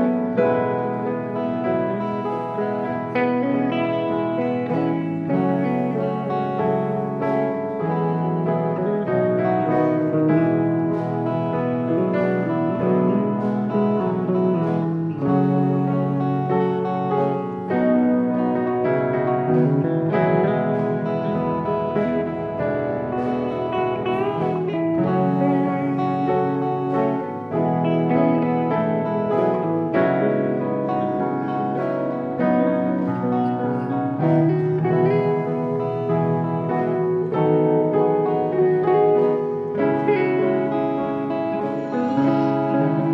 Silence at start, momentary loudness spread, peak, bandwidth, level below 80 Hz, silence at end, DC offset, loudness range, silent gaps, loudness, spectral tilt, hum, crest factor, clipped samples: 0 s; 5 LU; -6 dBFS; 5.8 kHz; -60 dBFS; 0 s; under 0.1%; 3 LU; none; -21 LUFS; -10 dB/octave; none; 14 dB; under 0.1%